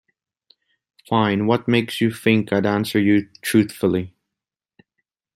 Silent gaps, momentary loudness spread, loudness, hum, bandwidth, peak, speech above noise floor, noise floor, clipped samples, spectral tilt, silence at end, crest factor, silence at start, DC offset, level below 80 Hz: none; 4 LU; -20 LUFS; none; 16 kHz; -2 dBFS; 67 dB; -86 dBFS; under 0.1%; -6 dB/octave; 1.25 s; 18 dB; 1.1 s; under 0.1%; -60 dBFS